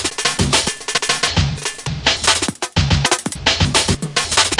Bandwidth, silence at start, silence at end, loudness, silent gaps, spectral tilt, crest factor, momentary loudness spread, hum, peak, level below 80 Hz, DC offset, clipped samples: 11.5 kHz; 0 s; 0 s; -16 LUFS; none; -2.5 dB/octave; 18 dB; 5 LU; none; 0 dBFS; -32 dBFS; under 0.1%; under 0.1%